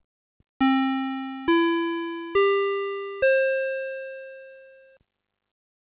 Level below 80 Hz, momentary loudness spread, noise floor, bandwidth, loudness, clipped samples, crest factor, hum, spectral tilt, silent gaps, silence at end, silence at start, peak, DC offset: -64 dBFS; 14 LU; -49 dBFS; 4.8 kHz; -24 LUFS; under 0.1%; 16 dB; none; -1 dB/octave; none; 1.3 s; 0.6 s; -10 dBFS; under 0.1%